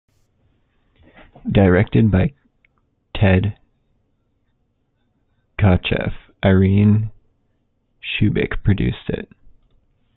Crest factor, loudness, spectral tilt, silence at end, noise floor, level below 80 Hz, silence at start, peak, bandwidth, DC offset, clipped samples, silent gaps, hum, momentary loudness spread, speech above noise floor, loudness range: 18 dB; -18 LUFS; -11.5 dB/octave; 0.9 s; -66 dBFS; -36 dBFS; 1.45 s; -2 dBFS; 4.1 kHz; under 0.1%; under 0.1%; none; none; 16 LU; 51 dB; 5 LU